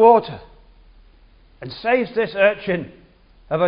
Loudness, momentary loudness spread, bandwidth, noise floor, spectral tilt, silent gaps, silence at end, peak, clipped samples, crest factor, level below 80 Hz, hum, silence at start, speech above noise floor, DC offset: -19 LUFS; 21 LU; 5.4 kHz; -50 dBFS; -10.5 dB/octave; none; 0 s; 0 dBFS; under 0.1%; 20 dB; -52 dBFS; none; 0 s; 33 dB; under 0.1%